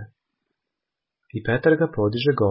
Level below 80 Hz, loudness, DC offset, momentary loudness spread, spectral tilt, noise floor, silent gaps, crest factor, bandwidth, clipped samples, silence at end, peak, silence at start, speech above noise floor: -52 dBFS; -21 LUFS; under 0.1%; 11 LU; -11.5 dB/octave; -85 dBFS; none; 18 dB; 5.8 kHz; under 0.1%; 0 s; -4 dBFS; 0 s; 65 dB